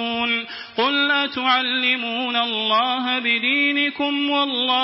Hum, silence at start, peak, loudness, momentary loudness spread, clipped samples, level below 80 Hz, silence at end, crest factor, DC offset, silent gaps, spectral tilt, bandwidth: none; 0 s; -6 dBFS; -19 LUFS; 4 LU; under 0.1%; -68 dBFS; 0 s; 16 dB; under 0.1%; none; -6.5 dB/octave; 5.8 kHz